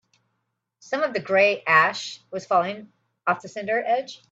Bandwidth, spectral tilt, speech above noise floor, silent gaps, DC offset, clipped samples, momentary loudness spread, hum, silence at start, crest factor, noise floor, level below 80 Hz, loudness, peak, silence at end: 7.8 kHz; -4 dB/octave; 54 dB; none; under 0.1%; under 0.1%; 14 LU; none; 0.85 s; 20 dB; -77 dBFS; -74 dBFS; -23 LUFS; -4 dBFS; 0.15 s